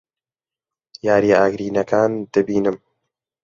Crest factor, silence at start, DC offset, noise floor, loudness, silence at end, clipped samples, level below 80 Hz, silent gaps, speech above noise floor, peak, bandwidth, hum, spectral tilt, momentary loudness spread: 18 dB; 1.05 s; under 0.1%; under -90 dBFS; -18 LUFS; 0.65 s; under 0.1%; -56 dBFS; none; over 73 dB; -2 dBFS; 7.4 kHz; none; -6.5 dB/octave; 9 LU